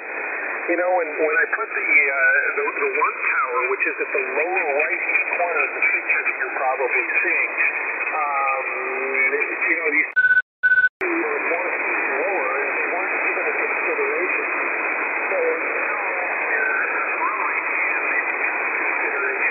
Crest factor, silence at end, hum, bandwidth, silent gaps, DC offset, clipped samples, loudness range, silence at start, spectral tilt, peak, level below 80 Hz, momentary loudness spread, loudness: 16 dB; 0 s; none; 4.5 kHz; 10.42-10.63 s, 10.89-11.00 s; under 0.1%; under 0.1%; 2 LU; 0 s; -6.5 dB/octave; -6 dBFS; -74 dBFS; 5 LU; -20 LUFS